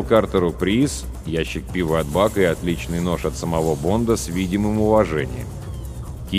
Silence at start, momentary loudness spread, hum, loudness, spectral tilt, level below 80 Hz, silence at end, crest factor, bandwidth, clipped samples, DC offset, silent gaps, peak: 0 s; 14 LU; none; -21 LUFS; -6 dB/octave; -34 dBFS; 0 s; 18 dB; 15.5 kHz; under 0.1%; under 0.1%; none; -4 dBFS